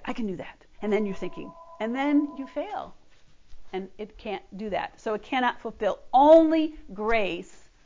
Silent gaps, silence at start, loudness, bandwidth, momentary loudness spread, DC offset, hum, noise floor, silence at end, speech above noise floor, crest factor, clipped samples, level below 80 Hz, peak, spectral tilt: none; 0 s; -25 LUFS; 7.6 kHz; 19 LU; under 0.1%; none; -51 dBFS; 0.2 s; 26 dB; 20 dB; under 0.1%; -54 dBFS; -6 dBFS; -6.5 dB/octave